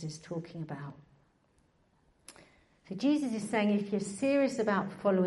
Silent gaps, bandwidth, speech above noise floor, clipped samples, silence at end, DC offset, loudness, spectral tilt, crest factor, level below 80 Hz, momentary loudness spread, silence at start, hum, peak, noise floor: none; 11.5 kHz; 38 dB; under 0.1%; 0 s; under 0.1%; -32 LUFS; -6 dB/octave; 16 dB; -72 dBFS; 13 LU; 0 s; none; -16 dBFS; -70 dBFS